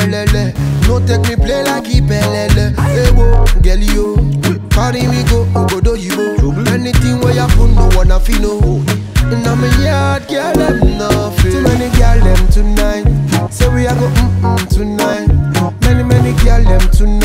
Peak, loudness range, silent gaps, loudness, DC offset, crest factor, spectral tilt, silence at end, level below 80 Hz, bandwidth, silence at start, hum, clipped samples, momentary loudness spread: 0 dBFS; 1 LU; none; -12 LUFS; under 0.1%; 10 dB; -6 dB/octave; 0 s; -12 dBFS; 16 kHz; 0 s; none; under 0.1%; 4 LU